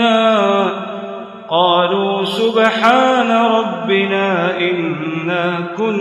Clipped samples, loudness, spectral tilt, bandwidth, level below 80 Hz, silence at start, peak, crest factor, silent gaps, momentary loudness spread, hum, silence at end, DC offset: under 0.1%; -15 LUFS; -5.5 dB/octave; 12.5 kHz; -66 dBFS; 0 s; 0 dBFS; 14 dB; none; 8 LU; none; 0 s; under 0.1%